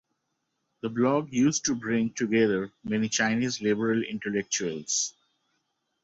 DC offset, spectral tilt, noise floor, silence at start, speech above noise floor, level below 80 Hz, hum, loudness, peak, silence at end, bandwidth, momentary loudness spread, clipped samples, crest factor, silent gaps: under 0.1%; -4 dB/octave; -79 dBFS; 0.85 s; 52 dB; -66 dBFS; none; -27 LUFS; -12 dBFS; 0.95 s; 8 kHz; 7 LU; under 0.1%; 16 dB; none